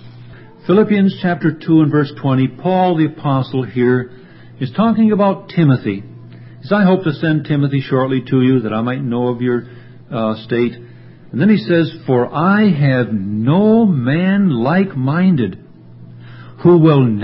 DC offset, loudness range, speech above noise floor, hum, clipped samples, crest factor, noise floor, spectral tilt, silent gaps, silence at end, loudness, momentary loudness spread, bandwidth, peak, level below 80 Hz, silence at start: under 0.1%; 4 LU; 24 dB; none; under 0.1%; 14 dB; -37 dBFS; -13 dB/octave; none; 0 s; -15 LUFS; 8 LU; 5.8 kHz; 0 dBFS; -52 dBFS; 0.05 s